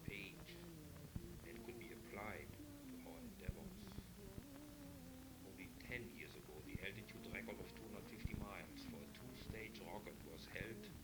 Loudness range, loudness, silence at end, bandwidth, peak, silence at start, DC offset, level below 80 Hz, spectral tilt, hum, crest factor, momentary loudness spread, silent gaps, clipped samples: 3 LU; -54 LUFS; 0 s; over 20 kHz; -32 dBFS; 0 s; under 0.1%; -62 dBFS; -5 dB/octave; none; 22 dB; 6 LU; none; under 0.1%